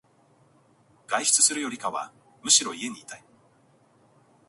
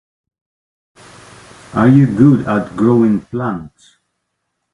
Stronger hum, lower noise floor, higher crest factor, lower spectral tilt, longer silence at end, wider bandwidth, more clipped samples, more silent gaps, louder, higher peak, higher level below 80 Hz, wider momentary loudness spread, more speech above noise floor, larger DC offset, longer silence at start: neither; second, -61 dBFS vs -72 dBFS; first, 24 dB vs 16 dB; second, 0.5 dB/octave vs -9 dB/octave; first, 1.3 s vs 1.05 s; about the same, 12 kHz vs 11 kHz; neither; neither; second, -23 LUFS vs -13 LUFS; second, -4 dBFS vs 0 dBFS; second, -78 dBFS vs -48 dBFS; first, 23 LU vs 12 LU; second, 36 dB vs 60 dB; neither; second, 1.1 s vs 1.75 s